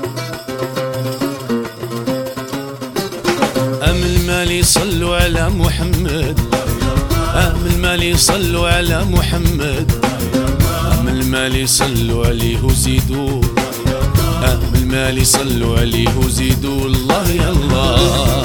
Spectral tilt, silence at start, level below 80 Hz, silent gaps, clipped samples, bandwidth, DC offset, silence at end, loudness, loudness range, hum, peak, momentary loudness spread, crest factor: -4.5 dB/octave; 0 s; -22 dBFS; none; under 0.1%; over 20 kHz; under 0.1%; 0 s; -15 LUFS; 3 LU; none; 0 dBFS; 9 LU; 14 dB